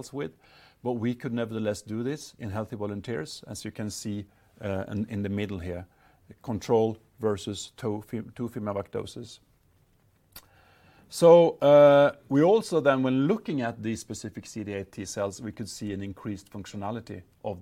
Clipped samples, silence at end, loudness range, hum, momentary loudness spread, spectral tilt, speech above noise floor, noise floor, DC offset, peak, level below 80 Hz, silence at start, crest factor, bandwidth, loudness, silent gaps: under 0.1%; 0 s; 14 LU; none; 19 LU; -6 dB/octave; 38 dB; -65 dBFS; under 0.1%; -6 dBFS; -62 dBFS; 0 s; 22 dB; 15.5 kHz; -27 LUFS; none